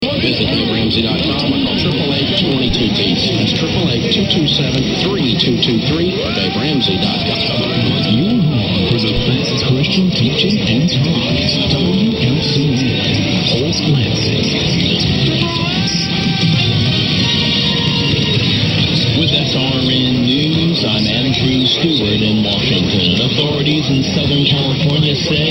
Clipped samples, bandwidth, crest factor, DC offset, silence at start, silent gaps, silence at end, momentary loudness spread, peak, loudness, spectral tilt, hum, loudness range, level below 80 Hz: under 0.1%; 15 kHz; 14 dB; under 0.1%; 0 s; none; 0 s; 2 LU; 0 dBFS; -13 LUFS; -5.5 dB/octave; none; 1 LU; -34 dBFS